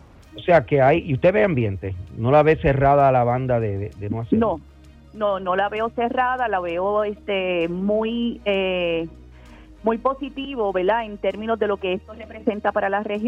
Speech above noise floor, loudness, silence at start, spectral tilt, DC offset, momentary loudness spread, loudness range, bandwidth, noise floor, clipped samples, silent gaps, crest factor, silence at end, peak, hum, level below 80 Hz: 23 dB; -21 LUFS; 0.35 s; -8.5 dB/octave; under 0.1%; 11 LU; 6 LU; 7.2 kHz; -44 dBFS; under 0.1%; none; 18 dB; 0 s; -4 dBFS; none; -44 dBFS